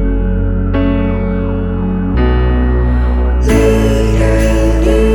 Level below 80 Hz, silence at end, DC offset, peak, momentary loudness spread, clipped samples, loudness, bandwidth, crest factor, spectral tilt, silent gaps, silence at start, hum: -14 dBFS; 0 s; under 0.1%; 0 dBFS; 5 LU; under 0.1%; -13 LUFS; 12 kHz; 10 dB; -7.5 dB/octave; none; 0 s; none